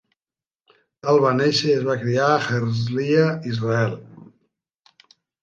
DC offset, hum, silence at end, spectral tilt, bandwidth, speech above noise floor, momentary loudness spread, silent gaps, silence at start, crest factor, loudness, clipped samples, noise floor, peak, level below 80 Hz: under 0.1%; none; 1.2 s; -6 dB/octave; 9 kHz; over 70 dB; 7 LU; none; 1.05 s; 18 dB; -20 LUFS; under 0.1%; under -90 dBFS; -4 dBFS; -62 dBFS